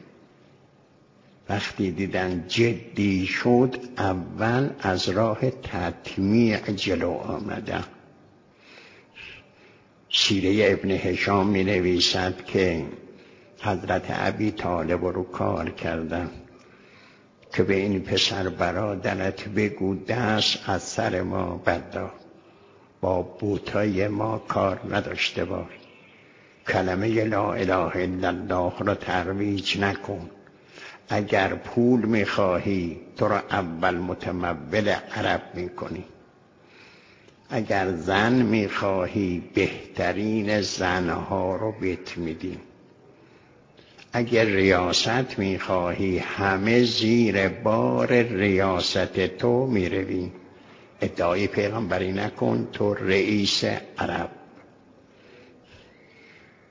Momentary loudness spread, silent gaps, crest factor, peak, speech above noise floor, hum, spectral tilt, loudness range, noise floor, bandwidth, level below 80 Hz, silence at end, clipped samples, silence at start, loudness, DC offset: 11 LU; none; 22 dB; -4 dBFS; 33 dB; none; -5.5 dB/octave; 6 LU; -57 dBFS; 7.6 kHz; -48 dBFS; 1.3 s; under 0.1%; 1.5 s; -24 LUFS; under 0.1%